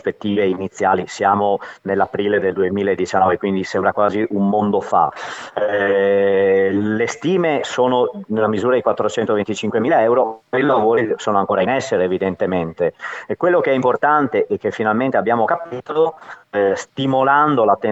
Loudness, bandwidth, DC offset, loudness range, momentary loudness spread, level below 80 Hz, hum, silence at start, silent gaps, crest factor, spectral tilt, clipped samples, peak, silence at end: -18 LUFS; 8.2 kHz; under 0.1%; 1 LU; 6 LU; -60 dBFS; none; 0.05 s; none; 16 dB; -6 dB/octave; under 0.1%; -2 dBFS; 0 s